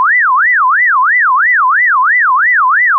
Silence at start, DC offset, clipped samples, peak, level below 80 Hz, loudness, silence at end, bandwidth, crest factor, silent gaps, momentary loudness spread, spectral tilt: 0 s; under 0.1%; under 0.1%; -4 dBFS; under -90 dBFS; -8 LUFS; 0 s; 2.2 kHz; 6 dB; none; 0 LU; 23.5 dB/octave